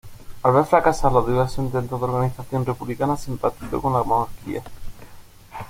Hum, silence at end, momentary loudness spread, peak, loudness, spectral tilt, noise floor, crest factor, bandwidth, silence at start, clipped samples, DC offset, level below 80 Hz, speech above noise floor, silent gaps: none; 0 s; 13 LU; -2 dBFS; -22 LUFS; -7 dB/octave; -42 dBFS; 20 dB; 16.5 kHz; 0.05 s; under 0.1%; under 0.1%; -38 dBFS; 22 dB; none